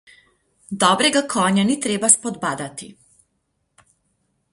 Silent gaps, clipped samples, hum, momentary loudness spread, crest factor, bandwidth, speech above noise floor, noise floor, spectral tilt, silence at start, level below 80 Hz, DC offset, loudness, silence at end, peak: none; under 0.1%; none; 16 LU; 22 dB; 11.5 kHz; 52 dB; -71 dBFS; -2.5 dB/octave; 0.7 s; -64 dBFS; under 0.1%; -18 LUFS; 1.6 s; 0 dBFS